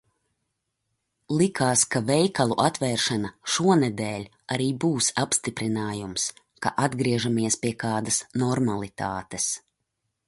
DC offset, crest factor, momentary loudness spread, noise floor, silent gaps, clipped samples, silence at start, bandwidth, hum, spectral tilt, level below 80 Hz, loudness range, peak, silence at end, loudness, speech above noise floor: under 0.1%; 20 dB; 9 LU; -79 dBFS; none; under 0.1%; 1.3 s; 11.5 kHz; none; -4 dB/octave; -60 dBFS; 3 LU; -6 dBFS; 0.7 s; -25 LUFS; 54 dB